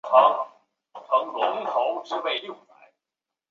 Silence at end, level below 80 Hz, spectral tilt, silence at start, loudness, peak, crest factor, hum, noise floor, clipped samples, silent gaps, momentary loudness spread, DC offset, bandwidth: 0.95 s; -82 dBFS; -3.5 dB/octave; 0.05 s; -24 LUFS; -2 dBFS; 22 dB; none; -88 dBFS; under 0.1%; none; 17 LU; under 0.1%; 7.2 kHz